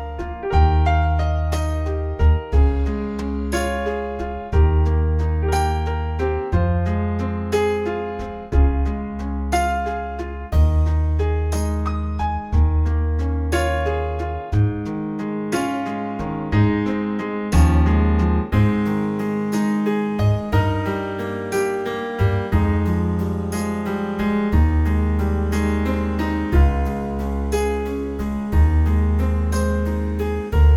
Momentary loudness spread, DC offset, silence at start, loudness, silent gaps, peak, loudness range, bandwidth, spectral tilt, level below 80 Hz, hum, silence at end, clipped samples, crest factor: 8 LU; under 0.1%; 0 s; -21 LUFS; none; -4 dBFS; 3 LU; 12 kHz; -7.5 dB/octave; -22 dBFS; none; 0 s; under 0.1%; 14 dB